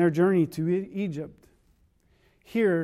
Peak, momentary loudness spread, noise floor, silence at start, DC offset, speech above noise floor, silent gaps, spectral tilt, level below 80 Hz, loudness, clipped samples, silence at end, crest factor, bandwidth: -12 dBFS; 13 LU; -64 dBFS; 0 s; under 0.1%; 40 dB; none; -8.5 dB/octave; -64 dBFS; -26 LUFS; under 0.1%; 0 s; 16 dB; 14 kHz